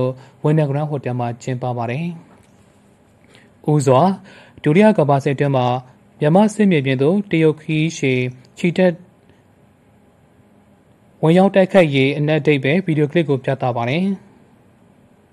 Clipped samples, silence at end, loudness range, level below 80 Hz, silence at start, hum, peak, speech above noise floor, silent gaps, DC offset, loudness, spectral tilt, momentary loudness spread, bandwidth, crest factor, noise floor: under 0.1%; 1.15 s; 7 LU; -62 dBFS; 0 s; none; 0 dBFS; 36 dB; none; under 0.1%; -17 LUFS; -7 dB/octave; 11 LU; 11 kHz; 18 dB; -52 dBFS